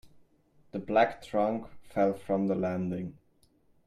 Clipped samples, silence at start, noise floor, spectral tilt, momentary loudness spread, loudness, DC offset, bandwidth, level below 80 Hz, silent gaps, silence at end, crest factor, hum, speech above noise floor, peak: under 0.1%; 0.05 s; -66 dBFS; -8 dB/octave; 13 LU; -30 LUFS; under 0.1%; 12.5 kHz; -64 dBFS; none; 0.75 s; 20 dB; none; 37 dB; -10 dBFS